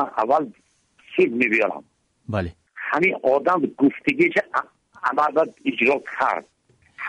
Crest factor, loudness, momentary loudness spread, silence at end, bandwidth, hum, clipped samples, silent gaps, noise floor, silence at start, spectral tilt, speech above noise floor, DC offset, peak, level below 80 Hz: 16 dB; -21 LUFS; 10 LU; 0 s; 10 kHz; none; under 0.1%; none; -50 dBFS; 0 s; -6.5 dB/octave; 29 dB; under 0.1%; -6 dBFS; -58 dBFS